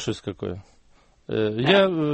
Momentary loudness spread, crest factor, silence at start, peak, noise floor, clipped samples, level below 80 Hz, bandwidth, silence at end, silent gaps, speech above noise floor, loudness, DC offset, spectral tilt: 15 LU; 18 dB; 0 s; -4 dBFS; -57 dBFS; under 0.1%; -56 dBFS; 8.4 kHz; 0 s; none; 34 dB; -23 LUFS; under 0.1%; -6 dB/octave